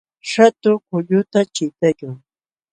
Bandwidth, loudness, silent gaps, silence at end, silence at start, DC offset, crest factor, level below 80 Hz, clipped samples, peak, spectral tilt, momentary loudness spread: 9.4 kHz; -17 LUFS; none; 0.55 s; 0.25 s; under 0.1%; 18 dB; -66 dBFS; under 0.1%; 0 dBFS; -5.5 dB/octave; 15 LU